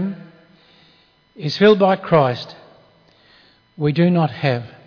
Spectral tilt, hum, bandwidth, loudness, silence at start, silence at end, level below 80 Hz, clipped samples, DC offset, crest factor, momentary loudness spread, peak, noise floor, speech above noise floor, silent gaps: -8 dB/octave; none; 5.4 kHz; -17 LUFS; 0 s; 0.2 s; -60 dBFS; under 0.1%; under 0.1%; 16 dB; 16 LU; -2 dBFS; -55 dBFS; 39 dB; none